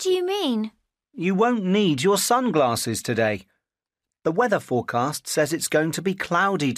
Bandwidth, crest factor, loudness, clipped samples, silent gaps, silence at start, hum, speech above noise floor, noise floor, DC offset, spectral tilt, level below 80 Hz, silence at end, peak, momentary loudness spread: 15.5 kHz; 14 dB; -22 LUFS; under 0.1%; none; 0 s; none; 66 dB; -88 dBFS; under 0.1%; -4.5 dB/octave; -64 dBFS; 0 s; -8 dBFS; 6 LU